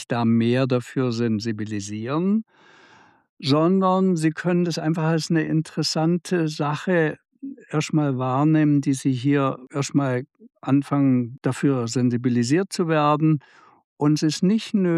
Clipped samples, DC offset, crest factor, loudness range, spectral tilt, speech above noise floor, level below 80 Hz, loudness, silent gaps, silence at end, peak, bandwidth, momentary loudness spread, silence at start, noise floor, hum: under 0.1%; under 0.1%; 14 dB; 2 LU; -6.5 dB/octave; 32 dB; -72 dBFS; -22 LUFS; 3.29-3.37 s, 13.84-13.97 s; 0 s; -8 dBFS; 12.5 kHz; 8 LU; 0 s; -53 dBFS; none